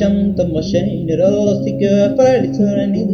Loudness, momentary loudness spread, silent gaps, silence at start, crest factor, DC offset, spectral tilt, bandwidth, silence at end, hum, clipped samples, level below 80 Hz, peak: -15 LUFS; 5 LU; none; 0 s; 12 dB; under 0.1%; -7.5 dB/octave; 6.8 kHz; 0 s; none; under 0.1%; -38 dBFS; -2 dBFS